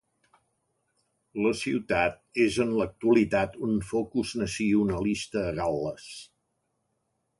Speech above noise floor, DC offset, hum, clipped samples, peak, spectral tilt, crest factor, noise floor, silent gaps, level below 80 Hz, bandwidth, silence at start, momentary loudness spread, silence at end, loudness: 50 dB; under 0.1%; none; under 0.1%; -10 dBFS; -5.5 dB/octave; 18 dB; -77 dBFS; none; -52 dBFS; 11.5 kHz; 1.35 s; 9 LU; 1.15 s; -27 LUFS